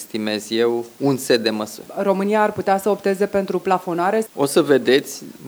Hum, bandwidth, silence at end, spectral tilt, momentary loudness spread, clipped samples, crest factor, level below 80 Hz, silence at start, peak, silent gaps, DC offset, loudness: none; over 20 kHz; 0 s; -4.5 dB/octave; 8 LU; under 0.1%; 18 dB; -64 dBFS; 0 s; -2 dBFS; none; under 0.1%; -19 LUFS